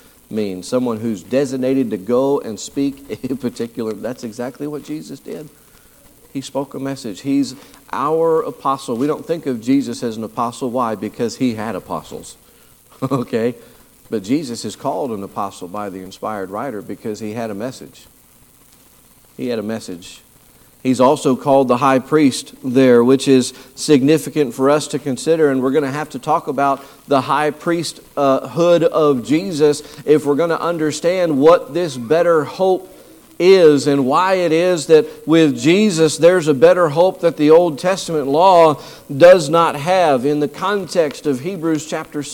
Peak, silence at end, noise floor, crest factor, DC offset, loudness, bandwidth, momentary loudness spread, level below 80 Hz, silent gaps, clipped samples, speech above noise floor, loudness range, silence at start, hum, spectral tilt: 0 dBFS; 0 s; -49 dBFS; 16 dB; under 0.1%; -16 LUFS; 18 kHz; 15 LU; -56 dBFS; none; under 0.1%; 33 dB; 14 LU; 0.3 s; none; -5.5 dB/octave